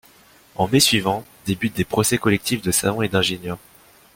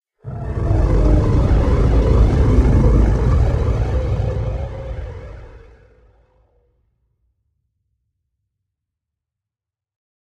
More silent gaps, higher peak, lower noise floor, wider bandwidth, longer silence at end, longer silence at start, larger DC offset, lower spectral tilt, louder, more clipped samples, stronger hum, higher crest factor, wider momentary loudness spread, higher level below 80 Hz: neither; about the same, -2 dBFS vs -2 dBFS; second, -51 dBFS vs -87 dBFS; first, 17 kHz vs 6.8 kHz; second, 0.6 s vs 4.75 s; first, 0.6 s vs 0.25 s; neither; second, -3.5 dB/octave vs -9 dB/octave; second, -20 LUFS vs -17 LUFS; neither; neither; about the same, 20 dB vs 16 dB; about the same, 13 LU vs 15 LU; second, -50 dBFS vs -20 dBFS